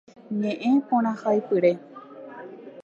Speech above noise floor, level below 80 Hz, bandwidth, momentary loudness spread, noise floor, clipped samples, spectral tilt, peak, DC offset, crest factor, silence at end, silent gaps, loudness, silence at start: 19 dB; -80 dBFS; 7.6 kHz; 20 LU; -42 dBFS; under 0.1%; -8 dB/octave; -8 dBFS; under 0.1%; 16 dB; 0 s; none; -24 LUFS; 0.3 s